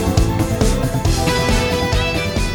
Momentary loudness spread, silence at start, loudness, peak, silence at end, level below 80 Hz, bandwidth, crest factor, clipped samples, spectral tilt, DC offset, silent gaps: 2 LU; 0 s; -17 LUFS; 0 dBFS; 0 s; -22 dBFS; over 20 kHz; 16 dB; under 0.1%; -5 dB/octave; under 0.1%; none